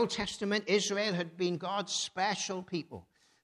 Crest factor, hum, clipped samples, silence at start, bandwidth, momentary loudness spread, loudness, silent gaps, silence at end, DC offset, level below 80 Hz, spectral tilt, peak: 16 dB; none; under 0.1%; 0 s; 12 kHz; 10 LU; -33 LUFS; none; 0.4 s; under 0.1%; -66 dBFS; -3.5 dB/octave; -16 dBFS